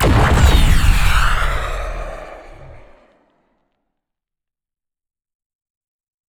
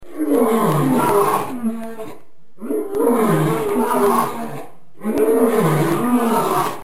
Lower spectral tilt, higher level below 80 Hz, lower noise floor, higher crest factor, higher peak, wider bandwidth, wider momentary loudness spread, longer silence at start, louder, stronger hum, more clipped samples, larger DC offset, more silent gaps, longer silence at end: second, -5 dB/octave vs -6.5 dB/octave; first, -20 dBFS vs -54 dBFS; first, -85 dBFS vs -46 dBFS; about the same, 18 dB vs 14 dB; first, 0 dBFS vs -4 dBFS; first, 20 kHz vs 16.5 kHz; first, 20 LU vs 14 LU; about the same, 0 s vs 0 s; about the same, -16 LUFS vs -18 LUFS; neither; neither; second, under 0.1% vs 3%; neither; first, 3.5 s vs 0 s